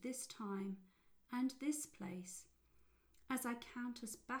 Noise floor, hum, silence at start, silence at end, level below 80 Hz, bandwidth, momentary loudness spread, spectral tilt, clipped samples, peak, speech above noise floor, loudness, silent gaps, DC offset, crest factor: -73 dBFS; none; 0 s; 0 s; -78 dBFS; over 20 kHz; 8 LU; -4 dB/octave; under 0.1%; -30 dBFS; 27 dB; -46 LUFS; none; under 0.1%; 16 dB